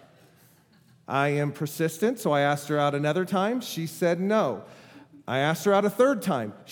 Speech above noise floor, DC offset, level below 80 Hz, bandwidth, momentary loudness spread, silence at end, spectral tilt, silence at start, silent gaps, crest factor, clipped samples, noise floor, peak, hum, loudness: 34 dB; under 0.1%; -80 dBFS; 19.5 kHz; 8 LU; 0 s; -5.5 dB/octave; 1.1 s; none; 18 dB; under 0.1%; -59 dBFS; -8 dBFS; none; -26 LUFS